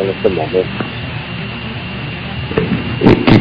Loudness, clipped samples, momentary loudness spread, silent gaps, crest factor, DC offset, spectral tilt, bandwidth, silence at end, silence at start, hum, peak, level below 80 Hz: -17 LUFS; 0.6%; 12 LU; none; 14 dB; under 0.1%; -8.5 dB/octave; 8 kHz; 0 s; 0 s; none; 0 dBFS; -32 dBFS